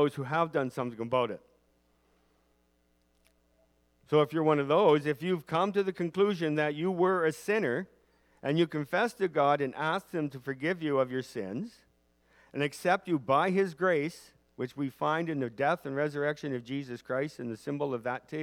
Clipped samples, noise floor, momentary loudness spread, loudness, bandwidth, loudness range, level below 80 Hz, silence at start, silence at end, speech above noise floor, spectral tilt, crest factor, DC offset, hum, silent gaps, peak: under 0.1%; -71 dBFS; 10 LU; -30 LUFS; 16 kHz; 6 LU; -74 dBFS; 0 s; 0 s; 41 dB; -6.5 dB/octave; 20 dB; under 0.1%; none; none; -10 dBFS